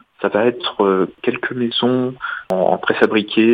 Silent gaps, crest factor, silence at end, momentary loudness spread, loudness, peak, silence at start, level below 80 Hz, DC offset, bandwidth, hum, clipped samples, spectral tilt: none; 18 dB; 0 s; 6 LU; -18 LUFS; 0 dBFS; 0.2 s; -60 dBFS; under 0.1%; 6.4 kHz; none; under 0.1%; -7 dB/octave